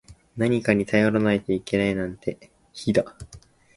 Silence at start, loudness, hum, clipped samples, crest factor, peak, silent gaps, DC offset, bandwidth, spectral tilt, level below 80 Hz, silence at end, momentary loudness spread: 0.1 s; -24 LUFS; none; under 0.1%; 22 dB; -4 dBFS; none; under 0.1%; 11.5 kHz; -6.5 dB/octave; -52 dBFS; 0.4 s; 13 LU